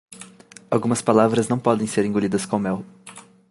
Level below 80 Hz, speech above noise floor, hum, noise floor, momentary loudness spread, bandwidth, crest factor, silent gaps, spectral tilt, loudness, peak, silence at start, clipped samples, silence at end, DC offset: -58 dBFS; 26 dB; none; -46 dBFS; 24 LU; 11.5 kHz; 20 dB; none; -6 dB/octave; -21 LUFS; -2 dBFS; 0.1 s; under 0.1%; 0.3 s; under 0.1%